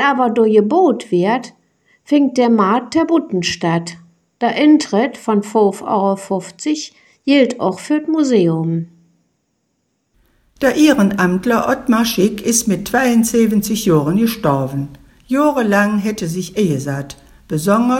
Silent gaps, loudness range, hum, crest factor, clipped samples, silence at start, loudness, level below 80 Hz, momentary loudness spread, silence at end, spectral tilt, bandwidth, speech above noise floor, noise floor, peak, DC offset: none; 3 LU; none; 14 dB; under 0.1%; 0 s; -15 LUFS; -50 dBFS; 9 LU; 0 s; -5 dB/octave; 17 kHz; 53 dB; -67 dBFS; 0 dBFS; under 0.1%